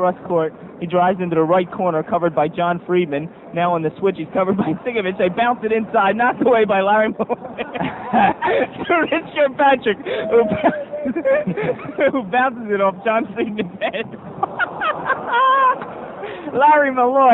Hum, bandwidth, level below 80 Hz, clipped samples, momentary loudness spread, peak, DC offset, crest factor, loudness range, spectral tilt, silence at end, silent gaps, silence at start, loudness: none; 4.1 kHz; -56 dBFS; under 0.1%; 10 LU; -2 dBFS; under 0.1%; 16 dB; 3 LU; -8.5 dB/octave; 0 s; none; 0 s; -18 LUFS